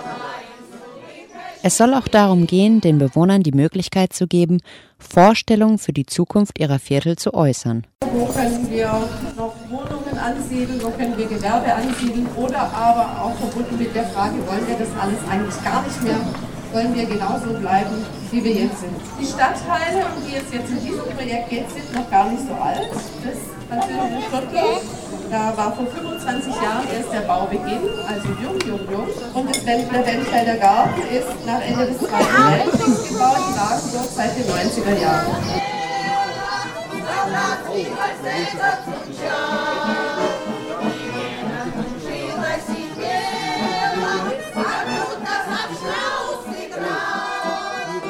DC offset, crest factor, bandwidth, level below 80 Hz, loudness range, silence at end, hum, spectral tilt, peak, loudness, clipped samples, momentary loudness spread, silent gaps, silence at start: under 0.1%; 18 dB; 16 kHz; -44 dBFS; 7 LU; 0 s; none; -5 dB/octave; -2 dBFS; -20 LUFS; under 0.1%; 12 LU; 7.95-7.99 s; 0 s